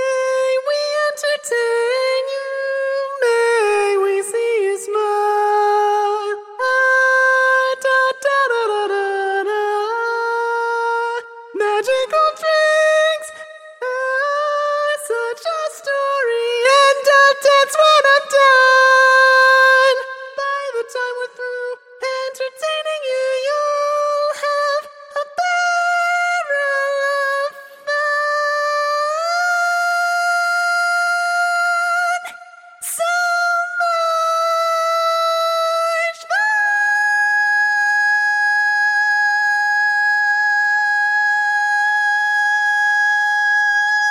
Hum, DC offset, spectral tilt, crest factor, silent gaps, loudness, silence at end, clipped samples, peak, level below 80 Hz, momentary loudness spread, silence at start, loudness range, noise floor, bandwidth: none; under 0.1%; 1.5 dB/octave; 16 dB; none; -16 LUFS; 0 s; under 0.1%; -2 dBFS; -78 dBFS; 11 LU; 0 s; 7 LU; -40 dBFS; 16 kHz